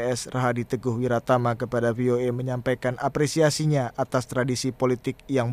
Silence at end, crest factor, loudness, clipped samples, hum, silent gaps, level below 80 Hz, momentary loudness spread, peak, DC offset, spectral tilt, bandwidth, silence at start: 0 s; 16 dB; -25 LUFS; under 0.1%; none; none; -54 dBFS; 5 LU; -8 dBFS; under 0.1%; -6 dB/octave; 15.5 kHz; 0 s